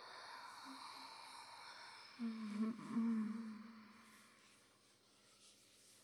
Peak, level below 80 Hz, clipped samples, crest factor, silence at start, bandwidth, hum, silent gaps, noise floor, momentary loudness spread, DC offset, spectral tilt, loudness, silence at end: -32 dBFS; under -90 dBFS; under 0.1%; 18 dB; 0 s; 12.5 kHz; none; none; -72 dBFS; 24 LU; under 0.1%; -5 dB/octave; -47 LUFS; 0 s